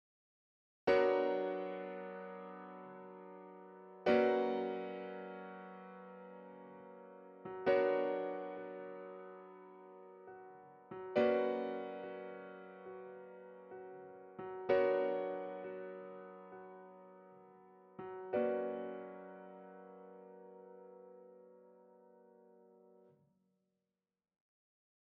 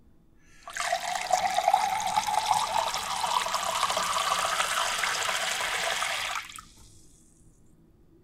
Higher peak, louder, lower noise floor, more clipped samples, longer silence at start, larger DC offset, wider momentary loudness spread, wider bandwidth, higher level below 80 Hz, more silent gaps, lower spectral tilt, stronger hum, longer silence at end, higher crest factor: second, -18 dBFS vs -8 dBFS; second, -38 LUFS vs -27 LUFS; first, under -90 dBFS vs -58 dBFS; neither; first, 0.85 s vs 0.55 s; neither; first, 23 LU vs 5 LU; second, 6.6 kHz vs 16.5 kHz; second, -80 dBFS vs -60 dBFS; neither; first, -4 dB/octave vs 0.5 dB/octave; neither; first, 2.85 s vs 1.15 s; about the same, 22 dB vs 22 dB